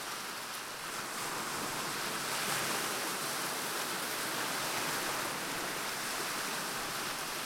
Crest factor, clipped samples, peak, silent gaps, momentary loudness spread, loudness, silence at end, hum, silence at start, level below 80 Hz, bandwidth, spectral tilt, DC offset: 16 dB; under 0.1%; -20 dBFS; none; 6 LU; -35 LUFS; 0 s; none; 0 s; -68 dBFS; 16.5 kHz; -1 dB/octave; under 0.1%